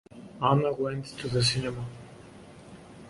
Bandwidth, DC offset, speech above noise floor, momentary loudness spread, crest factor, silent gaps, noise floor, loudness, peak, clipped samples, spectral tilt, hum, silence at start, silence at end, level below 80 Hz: 11.5 kHz; under 0.1%; 21 dB; 24 LU; 22 dB; none; -49 dBFS; -28 LUFS; -8 dBFS; under 0.1%; -5 dB/octave; none; 0.15 s; 0 s; -56 dBFS